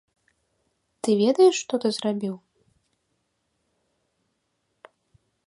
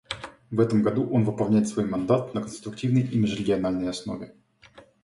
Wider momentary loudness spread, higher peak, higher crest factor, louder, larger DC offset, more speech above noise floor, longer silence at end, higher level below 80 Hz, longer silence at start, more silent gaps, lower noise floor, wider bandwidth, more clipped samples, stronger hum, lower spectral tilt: about the same, 14 LU vs 13 LU; about the same, -8 dBFS vs -6 dBFS; about the same, 20 dB vs 18 dB; about the same, -23 LUFS vs -25 LUFS; neither; first, 54 dB vs 29 dB; first, 3.1 s vs 0.25 s; second, -76 dBFS vs -56 dBFS; first, 1.05 s vs 0.1 s; neither; first, -75 dBFS vs -53 dBFS; about the same, 11.5 kHz vs 11.5 kHz; neither; neither; second, -5 dB/octave vs -7 dB/octave